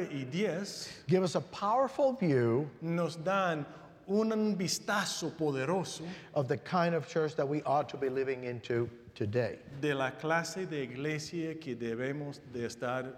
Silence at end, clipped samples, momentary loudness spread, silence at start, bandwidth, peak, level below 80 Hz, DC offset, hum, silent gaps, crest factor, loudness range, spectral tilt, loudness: 0 s; under 0.1%; 9 LU; 0 s; 16 kHz; -16 dBFS; -72 dBFS; under 0.1%; none; none; 18 dB; 4 LU; -5.5 dB/octave; -33 LUFS